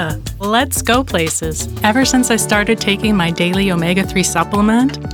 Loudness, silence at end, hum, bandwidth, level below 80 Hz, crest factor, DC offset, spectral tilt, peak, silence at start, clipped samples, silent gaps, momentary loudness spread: -15 LUFS; 0 s; none; over 20 kHz; -32 dBFS; 14 dB; under 0.1%; -4 dB/octave; 0 dBFS; 0 s; under 0.1%; none; 4 LU